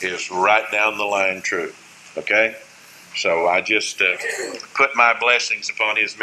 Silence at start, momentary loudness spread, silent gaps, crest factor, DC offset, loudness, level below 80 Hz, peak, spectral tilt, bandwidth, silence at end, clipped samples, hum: 0 s; 12 LU; none; 20 dB; under 0.1%; -18 LUFS; -68 dBFS; -2 dBFS; -1.5 dB/octave; 14 kHz; 0 s; under 0.1%; none